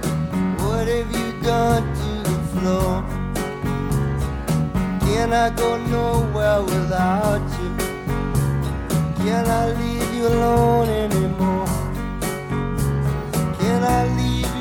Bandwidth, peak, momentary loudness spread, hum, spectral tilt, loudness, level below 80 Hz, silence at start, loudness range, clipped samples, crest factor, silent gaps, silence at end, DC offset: 17.5 kHz; -6 dBFS; 7 LU; none; -6.5 dB/octave; -21 LUFS; -30 dBFS; 0 s; 2 LU; under 0.1%; 16 dB; none; 0 s; under 0.1%